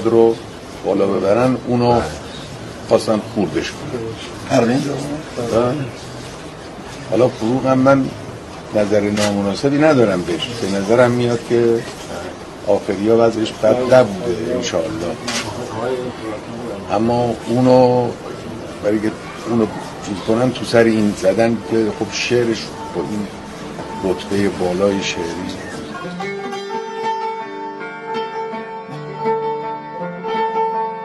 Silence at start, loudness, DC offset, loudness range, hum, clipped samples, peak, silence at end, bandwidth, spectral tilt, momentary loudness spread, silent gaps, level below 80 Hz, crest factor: 0 s; -18 LUFS; under 0.1%; 7 LU; none; under 0.1%; 0 dBFS; 0 s; 12.5 kHz; -5.5 dB/octave; 15 LU; none; -46 dBFS; 18 dB